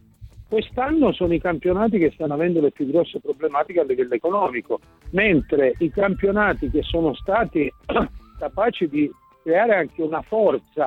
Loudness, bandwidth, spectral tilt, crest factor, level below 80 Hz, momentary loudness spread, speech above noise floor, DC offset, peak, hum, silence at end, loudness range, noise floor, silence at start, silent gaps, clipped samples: -21 LUFS; 4.6 kHz; -8.5 dB/octave; 16 dB; -40 dBFS; 7 LU; 23 dB; under 0.1%; -6 dBFS; none; 0 s; 2 LU; -44 dBFS; 0.2 s; none; under 0.1%